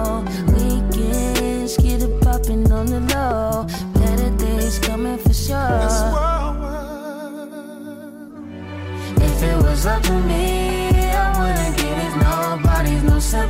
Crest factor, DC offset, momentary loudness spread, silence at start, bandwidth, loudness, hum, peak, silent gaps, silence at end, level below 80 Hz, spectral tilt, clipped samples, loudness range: 12 dB; under 0.1%; 14 LU; 0 s; 16.5 kHz; -19 LUFS; none; -6 dBFS; none; 0 s; -20 dBFS; -5.5 dB/octave; under 0.1%; 5 LU